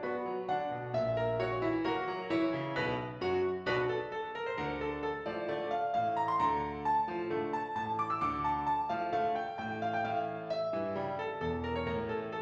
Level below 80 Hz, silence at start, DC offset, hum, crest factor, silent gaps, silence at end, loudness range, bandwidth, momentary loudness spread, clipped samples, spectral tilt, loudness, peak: -60 dBFS; 0 s; under 0.1%; none; 14 dB; none; 0 s; 2 LU; 8 kHz; 5 LU; under 0.1%; -7 dB/octave; -34 LUFS; -20 dBFS